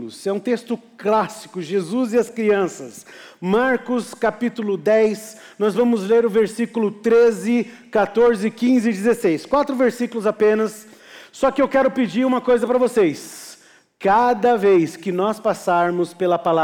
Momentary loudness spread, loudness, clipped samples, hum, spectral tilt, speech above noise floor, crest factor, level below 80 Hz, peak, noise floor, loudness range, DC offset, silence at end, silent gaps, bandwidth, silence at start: 9 LU; -19 LUFS; under 0.1%; none; -6 dB/octave; 30 dB; 10 dB; -58 dBFS; -8 dBFS; -49 dBFS; 3 LU; under 0.1%; 0 s; none; 16.5 kHz; 0 s